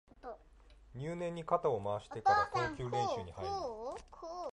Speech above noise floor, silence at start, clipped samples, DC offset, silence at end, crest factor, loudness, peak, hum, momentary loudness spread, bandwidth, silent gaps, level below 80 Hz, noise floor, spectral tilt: 24 dB; 0.25 s; under 0.1%; under 0.1%; 0 s; 20 dB; -36 LUFS; -18 dBFS; none; 20 LU; 11 kHz; none; -60 dBFS; -61 dBFS; -5.5 dB/octave